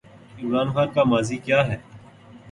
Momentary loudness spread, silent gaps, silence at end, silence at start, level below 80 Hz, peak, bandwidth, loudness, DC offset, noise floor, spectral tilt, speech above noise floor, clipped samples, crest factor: 10 LU; none; 0 s; 0.35 s; -54 dBFS; -6 dBFS; 11.5 kHz; -22 LUFS; under 0.1%; -46 dBFS; -6 dB/octave; 25 dB; under 0.1%; 18 dB